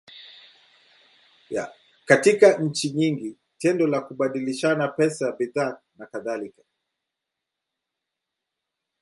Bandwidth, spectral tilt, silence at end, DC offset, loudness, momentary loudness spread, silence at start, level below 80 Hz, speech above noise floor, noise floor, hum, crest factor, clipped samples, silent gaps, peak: 11.5 kHz; -5 dB/octave; 2.5 s; under 0.1%; -23 LUFS; 20 LU; 0.15 s; -72 dBFS; 62 dB; -84 dBFS; none; 24 dB; under 0.1%; none; -2 dBFS